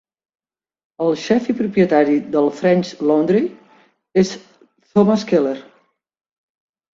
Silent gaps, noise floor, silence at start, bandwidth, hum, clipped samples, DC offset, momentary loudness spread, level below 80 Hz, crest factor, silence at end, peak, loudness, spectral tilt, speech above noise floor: none; -60 dBFS; 1 s; 7.8 kHz; none; under 0.1%; under 0.1%; 7 LU; -60 dBFS; 18 dB; 1.35 s; -2 dBFS; -17 LUFS; -7 dB/octave; 44 dB